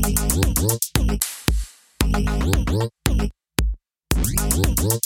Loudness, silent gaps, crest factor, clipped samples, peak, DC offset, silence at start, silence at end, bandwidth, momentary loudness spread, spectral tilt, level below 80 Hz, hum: -22 LUFS; none; 18 dB; under 0.1%; -2 dBFS; under 0.1%; 0 s; 0.05 s; 17 kHz; 6 LU; -4.5 dB/octave; -24 dBFS; none